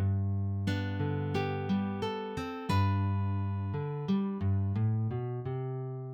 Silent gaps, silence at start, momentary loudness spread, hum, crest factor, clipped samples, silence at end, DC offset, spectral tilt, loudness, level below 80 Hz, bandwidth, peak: none; 0 s; 6 LU; none; 14 dB; under 0.1%; 0 s; under 0.1%; -8 dB/octave; -33 LUFS; -62 dBFS; 8.2 kHz; -18 dBFS